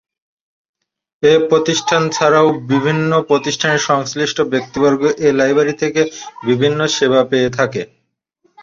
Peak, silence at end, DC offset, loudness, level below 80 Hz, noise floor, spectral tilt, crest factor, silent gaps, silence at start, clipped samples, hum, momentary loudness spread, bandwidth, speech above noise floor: 0 dBFS; 0.8 s; under 0.1%; -15 LUFS; -54 dBFS; -62 dBFS; -4.5 dB/octave; 14 dB; none; 1.2 s; under 0.1%; none; 6 LU; 7.6 kHz; 47 dB